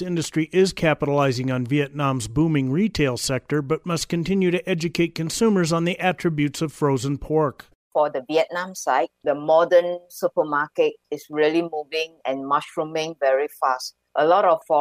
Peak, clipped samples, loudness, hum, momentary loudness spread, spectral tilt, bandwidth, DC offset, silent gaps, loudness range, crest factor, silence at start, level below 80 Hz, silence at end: -6 dBFS; under 0.1%; -22 LUFS; none; 7 LU; -5.5 dB/octave; 15.5 kHz; under 0.1%; 7.75-7.91 s; 2 LU; 16 dB; 0 s; -50 dBFS; 0 s